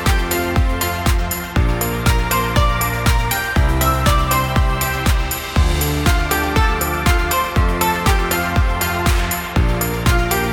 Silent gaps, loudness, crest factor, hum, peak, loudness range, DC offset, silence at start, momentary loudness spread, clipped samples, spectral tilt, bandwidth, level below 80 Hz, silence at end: none; -17 LUFS; 14 dB; none; -2 dBFS; 1 LU; under 0.1%; 0 s; 3 LU; under 0.1%; -4.5 dB/octave; 19 kHz; -20 dBFS; 0 s